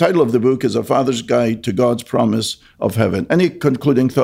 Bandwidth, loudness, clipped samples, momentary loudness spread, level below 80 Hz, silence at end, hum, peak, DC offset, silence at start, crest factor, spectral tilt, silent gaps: 16 kHz; -17 LUFS; under 0.1%; 4 LU; -52 dBFS; 0 s; none; -2 dBFS; under 0.1%; 0 s; 14 dB; -6.5 dB/octave; none